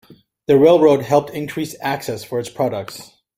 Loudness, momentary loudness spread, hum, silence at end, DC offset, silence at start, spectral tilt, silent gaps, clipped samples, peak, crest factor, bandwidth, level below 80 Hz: -17 LUFS; 18 LU; none; 0.35 s; under 0.1%; 0.5 s; -6 dB/octave; none; under 0.1%; -2 dBFS; 16 dB; 16.5 kHz; -56 dBFS